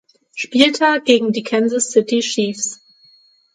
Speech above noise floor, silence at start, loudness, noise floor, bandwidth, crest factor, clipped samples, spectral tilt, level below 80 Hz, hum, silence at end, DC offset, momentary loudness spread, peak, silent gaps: 37 dB; 0.35 s; -16 LUFS; -53 dBFS; 11 kHz; 18 dB; under 0.1%; -2.5 dB/octave; -64 dBFS; none; 0.8 s; under 0.1%; 11 LU; 0 dBFS; none